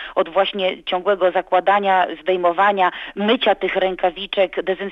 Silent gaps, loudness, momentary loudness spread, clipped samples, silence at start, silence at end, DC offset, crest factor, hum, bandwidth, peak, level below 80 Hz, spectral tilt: none; -19 LUFS; 6 LU; under 0.1%; 0 s; 0 s; under 0.1%; 16 dB; none; 5.6 kHz; -4 dBFS; -54 dBFS; -6.5 dB/octave